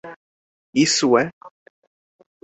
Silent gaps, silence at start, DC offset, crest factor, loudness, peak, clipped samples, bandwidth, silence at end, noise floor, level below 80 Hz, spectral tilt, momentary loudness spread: 0.16-0.73 s, 1.33-1.41 s; 0.05 s; under 0.1%; 20 dB; -19 LUFS; -2 dBFS; under 0.1%; 8.2 kHz; 0.95 s; under -90 dBFS; -66 dBFS; -3.5 dB/octave; 13 LU